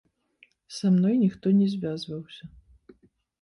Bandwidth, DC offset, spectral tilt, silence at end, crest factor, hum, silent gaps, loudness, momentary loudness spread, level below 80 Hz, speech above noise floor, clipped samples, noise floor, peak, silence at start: 11 kHz; under 0.1%; -8 dB/octave; 0.95 s; 14 dB; none; none; -25 LUFS; 19 LU; -62 dBFS; 39 dB; under 0.1%; -63 dBFS; -14 dBFS; 0.7 s